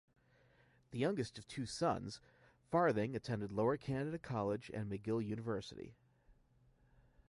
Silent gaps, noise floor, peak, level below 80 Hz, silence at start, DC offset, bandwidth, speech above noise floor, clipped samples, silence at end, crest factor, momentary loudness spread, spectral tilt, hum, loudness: none; -71 dBFS; -22 dBFS; -68 dBFS; 0.9 s; under 0.1%; 11.5 kHz; 32 dB; under 0.1%; 0.95 s; 20 dB; 14 LU; -6.5 dB/octave; none; -40 LUFS